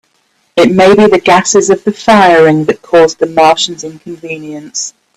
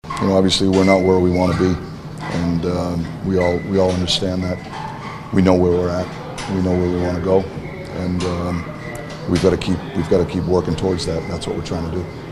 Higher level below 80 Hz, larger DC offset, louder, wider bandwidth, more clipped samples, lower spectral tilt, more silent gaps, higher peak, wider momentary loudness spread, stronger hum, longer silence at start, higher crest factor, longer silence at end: second, -46 dBFS vs -38 dBFS; neither; first, -8 LUFS vs -19 LUFS; about the same, 13.5 kHz vs 12.5 kHz; first, 0.2% vs under 0.1%; second, -4 dB/octave vs -6 dB/octave; neither; about the same, 0 dBFS vs 0 dBFS; first, 17 LU vs 14 LU; neither; first, 0.55 s vs 0.05 s; second, 8 dB vs 18 dB; first, 0.25 s vs 0 s